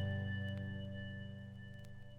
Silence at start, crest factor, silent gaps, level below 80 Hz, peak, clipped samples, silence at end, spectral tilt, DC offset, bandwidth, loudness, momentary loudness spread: 0 s; 14 dB; none; -64 dBFS; -28 dBFS; under 0.1%; 0 s; -8 dB/octave; under 0.1%; 5 kHz; -45 LUFS; 12 LU